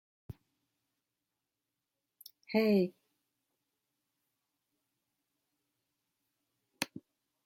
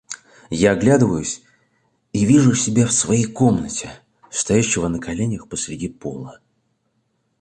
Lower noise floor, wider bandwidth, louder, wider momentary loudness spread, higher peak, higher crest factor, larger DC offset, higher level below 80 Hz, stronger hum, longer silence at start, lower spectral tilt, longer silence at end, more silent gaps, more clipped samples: first, -89 dBFS vs -68 dBFS; first, 16.5 kHz vs 10.5 kHz; second, -33 LUFS vs -19 LUFS; first, 25 LU vs 17 LU; second, -14 dBFS vs -2 dBFS; first, 28 dB vs 18 dB; neither; second, -76 dBFS vs -46 dBFS; neither; first, 0.3 s vs 0.1 s; about the same, -6 dB/octave vs -5 dB/octave; second, 0.45 s vs 1.05 s; neither; neither